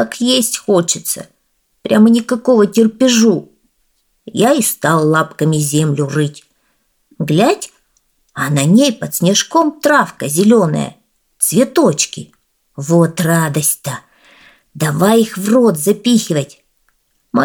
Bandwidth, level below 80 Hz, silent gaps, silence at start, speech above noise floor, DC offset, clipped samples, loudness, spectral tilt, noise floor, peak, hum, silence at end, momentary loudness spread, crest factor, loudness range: 19.5 kHz; -60 dBFS; none; 0 s; 50 dB; under 0.1%; under 0.1%; -13 LUFS; -4.5 dB/octave; -63 dBFS; 0 dBFS; none; 0 s; 10 LU; 14 dB; 3 LU